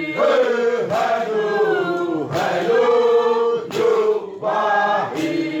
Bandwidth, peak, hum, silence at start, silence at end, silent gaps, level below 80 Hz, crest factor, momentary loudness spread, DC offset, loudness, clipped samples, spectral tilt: 13.5 kHz; -6 dBFS; none; 0 s; 0 s; none; -68 dBFS; 12 dB; 6 LU; under 0.1%; -19 LUFS; under 0.1%; -5 dB/octave